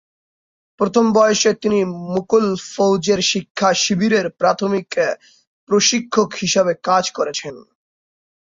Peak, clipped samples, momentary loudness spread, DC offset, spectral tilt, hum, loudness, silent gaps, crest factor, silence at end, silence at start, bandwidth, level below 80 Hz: -2 dBFS; under 0.1%; 8 LU; under 0.1%; -3.5 dB/octave; none; -17 LUFS; 3.50-3.55 s, 5.47-5.67 s; 16 dB; 0.95 s; 0.8 s; 7.8 kHz; -58 dBFS